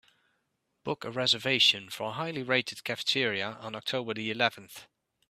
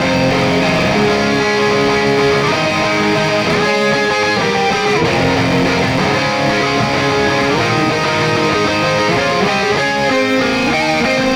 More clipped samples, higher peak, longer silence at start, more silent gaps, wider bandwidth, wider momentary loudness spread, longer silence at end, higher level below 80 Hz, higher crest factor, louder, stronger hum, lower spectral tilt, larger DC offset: neither; second, -8 dBFS vs -2 dBFS; first, 0.85 s vs 0 s; neither; second, 15.5 kHz vs over 20 kHz; first, 14 LU vs 1 LU; first, 0.45 s vs 0 s; second, -74 dBFS vs -40 dBFS; first, 24 dB vs 12 dB; second, -28 LUFS vs -13 LUFS; neither; second, -3 dB/octave vs -4.5 dB/octave; neither